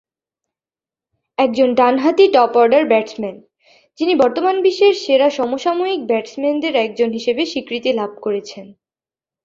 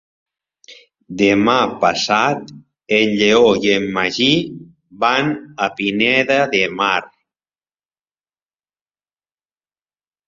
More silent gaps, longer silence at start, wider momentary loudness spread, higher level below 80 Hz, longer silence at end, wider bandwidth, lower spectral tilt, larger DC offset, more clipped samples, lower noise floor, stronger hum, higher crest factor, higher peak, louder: neither; first, 1.4 s vs 0.7 s; about the same, 11 LU vs 9 LU; second, -64 dBFS vs -56 dBFS; second, 0.75 s vs 3.2 s; about the same, 7.6 kHz vs 7.6 kHz; about the same, -4.5 dB/octave vs -4 dB/octave; neither; neither; about the same, under -90 dBFS vs under -90 dBFS; second, none vs 50 Hz at -50 dBFS; about the same, 16 dB vs 18 dB; about the same, 0 dBFS vs 0 dBFS; about the same, -16 LUFS vs -16 LUFS